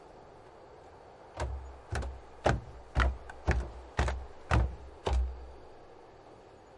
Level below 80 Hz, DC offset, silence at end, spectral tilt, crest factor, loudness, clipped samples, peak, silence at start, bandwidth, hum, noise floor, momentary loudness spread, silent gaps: -38 dBFS; under 0.1%; 0 s; -6 dB/octave; 24 dB; -35 LUFS; under 0.1%; -12 dBFS; 0 s; 11 kHz; none; -54 dBFS; 22 LU; none